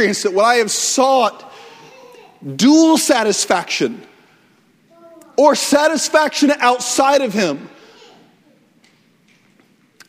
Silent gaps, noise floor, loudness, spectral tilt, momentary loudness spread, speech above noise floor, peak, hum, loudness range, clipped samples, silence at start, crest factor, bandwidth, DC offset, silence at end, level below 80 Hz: none; -55 dBFS; -14 LUFS; -2.5 dB/octave; 9 LU; 40 dB; 0 dBFS; none; 3 LU; under 0.1%; 0 s; 16 dB; 16 kHz; under 0.1%; 2.4 s; -64 dBFS